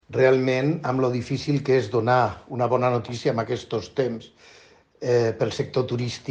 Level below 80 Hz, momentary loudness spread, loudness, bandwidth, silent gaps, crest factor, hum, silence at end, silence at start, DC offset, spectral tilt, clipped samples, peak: -58 dBFS; 8 LU; -24 LUFS; 8.8 kHz; none; 18 dB; none; 0 s; 0.1 s; under 0.1%; -6.5 dB/octave; under 0.1%; -6 dBFS